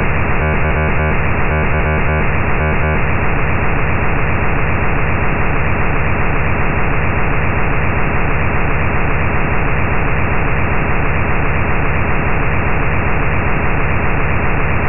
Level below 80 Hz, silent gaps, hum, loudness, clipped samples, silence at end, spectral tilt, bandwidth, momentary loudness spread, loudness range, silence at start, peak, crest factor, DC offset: -20 dBFS; none; none; -16 LUFS; under 0.1%; 0 s; -12.5 dB/octave; 3.1 kHz; 1 LU; 1 LU; 0 s; -2 dBFS; 12 dB; 10%